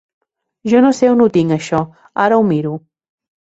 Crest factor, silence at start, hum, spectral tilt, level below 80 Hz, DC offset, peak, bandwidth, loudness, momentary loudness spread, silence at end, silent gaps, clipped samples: 14 dB; 0.65 s; none; -7 dB/octave; -54 dBFS; under 0.1%; -2 dBFS; 8 kHz; -14 LUFS; 13 LU; 0.65 s; none; under 0.1%